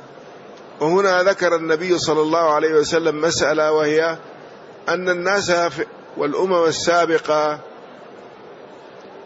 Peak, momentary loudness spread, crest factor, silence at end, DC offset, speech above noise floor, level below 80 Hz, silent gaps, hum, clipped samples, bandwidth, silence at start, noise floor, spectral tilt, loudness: -6 dBFS; 9 LU; 14 dB; 0 s; under 0.1%; 22 dB; -58 dBFS; none; none; under 0.1%; 8 kHz; 0 s; -40 dBFS; -4 dB/octave; -18 LUFS